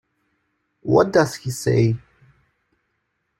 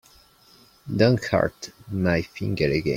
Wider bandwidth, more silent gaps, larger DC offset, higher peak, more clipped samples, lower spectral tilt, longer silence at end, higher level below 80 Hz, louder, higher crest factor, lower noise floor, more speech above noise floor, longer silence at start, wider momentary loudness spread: about the same, 16 kHz vs 16.5 kHz; neither; neither; about the same, -2 dBFS vs -4 dBFS; neither; about the same, -6.5 dB/octave vs -6.5 dB/octave; first, 1.4 s vs 0 s; second, -54 dBFS vs -48 dBFS; first, -20 LUFS vs -24 LUFS; about the same, 20 dB vs 20 dB; first, -73 dBFS vs -55 dBFS; first, 55 dB vs 32 dB; about the same, 0.85 s vs 0.85 s; about the same, 12 LU vs 12 LU